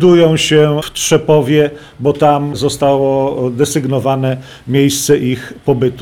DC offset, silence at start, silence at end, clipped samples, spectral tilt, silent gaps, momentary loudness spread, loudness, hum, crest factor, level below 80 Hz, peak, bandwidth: under 0.1%; 0 s; 0 s; under 0.1%; -5 dB/octave; none; 7 LU; -13 LUFS; none; 12 dB; -44 dBFS; -2 dBFS; 18 kHz